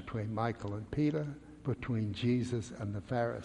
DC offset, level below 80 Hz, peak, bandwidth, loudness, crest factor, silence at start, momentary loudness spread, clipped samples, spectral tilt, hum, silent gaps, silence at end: under 0.1%; -58 dBFS; -18 dBFS; 10.5 kHz; -36 LUFS; 16 dB; 0 s; 8 LU; under 0.1%; -7.5 dB/octave; none; none; 0 s